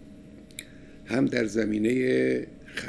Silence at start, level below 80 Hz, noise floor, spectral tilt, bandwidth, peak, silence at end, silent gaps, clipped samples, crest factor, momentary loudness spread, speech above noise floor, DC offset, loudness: 0 s; -56 dBFS; -47 dBFS; -6 dB/octave; 11 kHz; -10 dBFS; 0 s; none; under 0.1%; 18 dB; 18 LU; 21 dB; under 0.1%; -26 LUFS